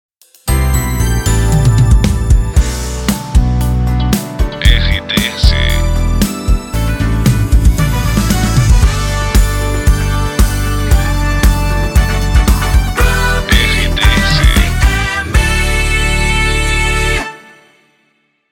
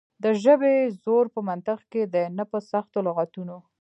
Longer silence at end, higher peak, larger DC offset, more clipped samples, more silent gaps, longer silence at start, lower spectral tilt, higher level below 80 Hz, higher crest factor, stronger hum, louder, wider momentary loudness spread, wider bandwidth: first, 1.15 s vs 0.2 s; first, 0 dBFS vs -6 dBFS; neither; neither; neither; first, 0.45 s vs 0.2 s; second, -4.5 dB/octave vs -7.5 dB/octave; first, -14 dBFS vs -80 dBFS; second, 12 dB vs 18 dB; neither; first, -13 LUFS vs -24 LUFS; second, 5 LU vs 11 LU; first, 17.5 kHz vs 8.4 kHz